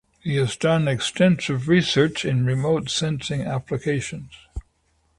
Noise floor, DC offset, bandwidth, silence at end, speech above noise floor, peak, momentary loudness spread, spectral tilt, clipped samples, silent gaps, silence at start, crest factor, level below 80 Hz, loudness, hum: -66 dBFS; under 0.1%; 11.5 kHz; 0.6 s; 44 dB; -6 dBFS; 16 LU; -5.5 dB/octave; under 0.1%; none; 0.25 s; 16 dB; -46 dBFS; -22 LUFS; none